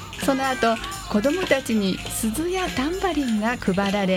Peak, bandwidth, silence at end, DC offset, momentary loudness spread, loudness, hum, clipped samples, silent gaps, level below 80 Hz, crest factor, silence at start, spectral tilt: -6 dBFS; 17 kHz; 0 s; under 0.1%; 4 LU; -23 LUFS; none; under 0.1%; none; -42 dBFS; 18 dB; 0 s; -4.5 dB/octave